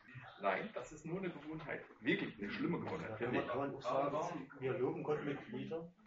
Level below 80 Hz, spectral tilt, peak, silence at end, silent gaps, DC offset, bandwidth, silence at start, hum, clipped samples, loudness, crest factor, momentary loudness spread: -72 dBFS; -5 dB/octave; -22 dBFS; 0 s; none; under 0.1%; 7.6 kHz; 0.05 s; none; under 0.1%; -41 LUFS; 18 dB; 8 LU